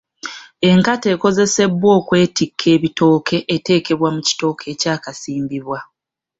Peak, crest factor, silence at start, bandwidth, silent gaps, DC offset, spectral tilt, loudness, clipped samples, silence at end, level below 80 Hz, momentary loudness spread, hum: -2 dBFS; 14 dB; 0.25 s; 8 kHz; none; under 0.1%; -5 dB/octave; -16 LUFS; under 0.1%; 0.55 s; -54 dBFS; 12 LU; none